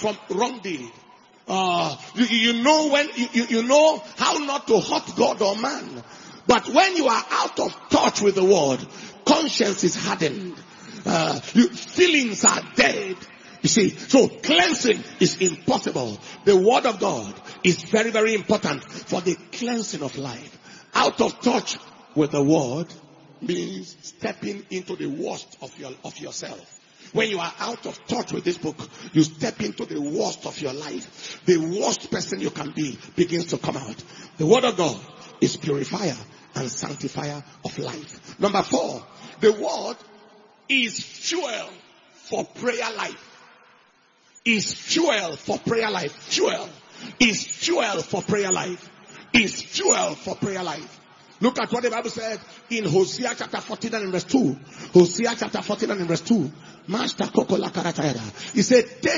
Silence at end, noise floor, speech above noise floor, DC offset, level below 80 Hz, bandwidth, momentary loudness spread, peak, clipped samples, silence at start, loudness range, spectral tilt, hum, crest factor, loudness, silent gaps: 0 s; -59 dBFS; 36 dB; under 0.1%; -62 dBFS; 7.6 kHz; 16 LU; -2 dBFS; under 0.1%; 0 s; 8 LU; -3.5 dB/octave; none; 22 dB; -22 LUFS; none